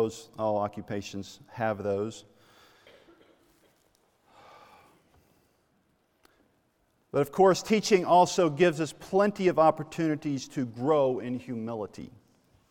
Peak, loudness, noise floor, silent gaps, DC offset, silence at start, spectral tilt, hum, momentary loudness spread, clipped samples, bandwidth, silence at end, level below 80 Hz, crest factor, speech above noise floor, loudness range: -8 dBFS; -27 LUFS; -71 dBFS; none; under 0.1%; 0 s; -5.5 dB/octave; none; 15 LU; under 0.1%; 16.5 kHz; 0.65 s; -68 dBFS; 20 dB; 44 dB; 13 LU